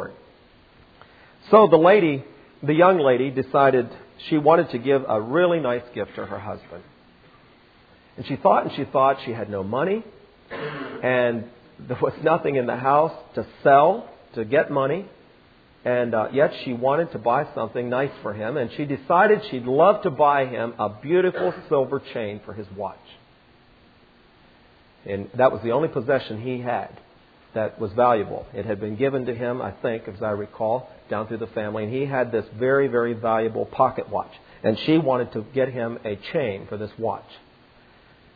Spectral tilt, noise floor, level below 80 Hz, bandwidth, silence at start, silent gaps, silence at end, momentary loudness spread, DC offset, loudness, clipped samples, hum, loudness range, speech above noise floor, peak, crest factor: -9.5 dB/octave; -54 dBFS; -60 dBFS; 5 kHz; 0 s; none; 1 s; 15 LU; under 0.1%; -22 LUFS; under 0.1%; none; 8 LU; 33 dB; -2 dBFS; 22 dB